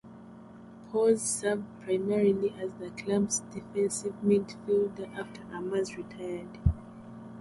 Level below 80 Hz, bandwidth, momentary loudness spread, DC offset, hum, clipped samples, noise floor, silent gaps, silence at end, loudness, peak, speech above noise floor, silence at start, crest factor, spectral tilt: -46 dBFS; 11.5 kHz; 20 LU; under 0.1%; none; under 0.1%; -49 dBFS; none; 0 s; -30 LUFS; -10 dBFS; 19 dB; 0.05 s; 20 dB; -5.5 dB/octave